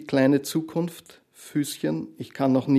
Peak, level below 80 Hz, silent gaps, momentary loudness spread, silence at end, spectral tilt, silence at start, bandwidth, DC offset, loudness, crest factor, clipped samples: -8 dBFS; -72 dBFS; none; 16 LU; 0 s; -6 dB/octave; 0 s; 14 kHz; under 0.1%; -26 LUFS; 16 dB; under 0.1%